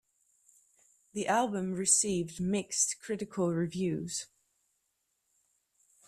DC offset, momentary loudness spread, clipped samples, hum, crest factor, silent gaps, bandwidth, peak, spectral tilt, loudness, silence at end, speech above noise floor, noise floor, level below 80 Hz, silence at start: under 0.1%; 12 LU; under 0.1%; none; 22 dB; none; 14 kHz; -12 dBFS; -3.5 dB/octave; -31 LUFS; 1.85 s; 48 dB; -80 dBFS; -68 dBFS; 1.15 s